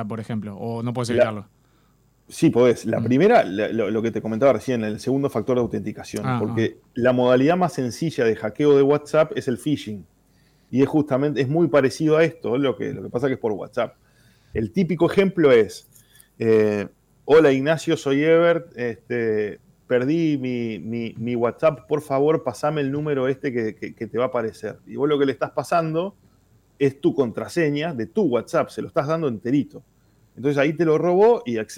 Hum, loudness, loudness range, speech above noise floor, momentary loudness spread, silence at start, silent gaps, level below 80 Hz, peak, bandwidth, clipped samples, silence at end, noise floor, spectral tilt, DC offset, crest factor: none; -21 LUFS; 4 LU; 39 dB; 12 LU; 0 s; none; -58 dBFS; -8 dBFS; 15.5 kHz; under 0.1%; 0 s; -60 dBFS; -7 dB/octave; under 0.1%; 14 dB